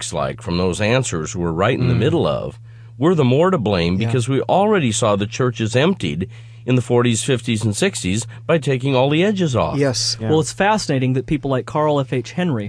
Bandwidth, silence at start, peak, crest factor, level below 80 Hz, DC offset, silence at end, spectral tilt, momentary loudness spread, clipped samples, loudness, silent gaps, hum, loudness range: 11 kHz; 0 s; -2 dBFS; 16 dB; -46 dBFS; under 0.1%; 0 s; -5.5 dB/octave; 7 LU; under 0.1%; -18 LUFS; none; none; 2 LU